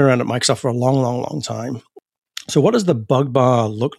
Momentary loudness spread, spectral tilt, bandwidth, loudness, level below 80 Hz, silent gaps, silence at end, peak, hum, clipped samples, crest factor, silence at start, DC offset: 13 LU; -5.5 dB/octave; 13.5 kHz; -18 LUFS; -62 dBFS; 2.18-2.22 s; 0.1 s; -2 dBFS; none; under 0.1%; 16 dB; 0 s; under 0.1%